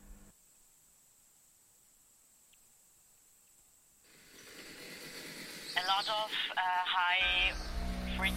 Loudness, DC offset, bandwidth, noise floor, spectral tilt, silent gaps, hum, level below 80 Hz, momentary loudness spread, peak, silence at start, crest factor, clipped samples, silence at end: -33 LUFS; under 0.1%; 16.5 kHz; -66 dBFS; -2.5 dB/octave; none; none; -50 dBFS; 21 LU; -16 dBFS; 0 s; 22 dB; under 0.1%; 0 s